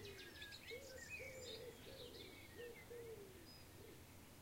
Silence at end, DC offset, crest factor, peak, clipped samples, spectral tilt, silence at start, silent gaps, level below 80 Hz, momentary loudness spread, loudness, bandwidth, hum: 0 s; under 0.1%; 16 dB; -40 dBFS; under 0.1%; -3 dB/octave; 0 s; none; -70 dBFS; 8 LU; -55 LUFS; 16 kHz; none